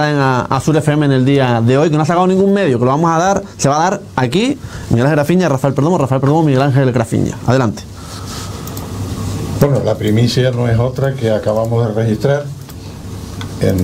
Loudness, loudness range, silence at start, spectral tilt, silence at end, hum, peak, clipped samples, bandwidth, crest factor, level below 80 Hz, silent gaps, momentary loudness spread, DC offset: -14 LUFS; 5 LU; 0 s; -6.5 dB/octave; 0 s; none; 0 dBFS; under 0.1%; 16 kHz; 14 dB; -38 dBFS; none; 13 LU; under 0.1%